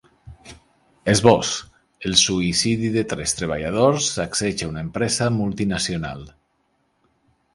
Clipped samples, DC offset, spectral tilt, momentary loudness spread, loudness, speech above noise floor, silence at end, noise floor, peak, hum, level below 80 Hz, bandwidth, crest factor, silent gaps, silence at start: under 0.1%; under 0.1%; -4 dB/octave; 12 LU; -20 LUFS; 47 dB; 1.25 s; -67 dBFS; 0 dBFS; none; -46 dBFS; 11.5 kHz; 22 dB; none; 0.25 s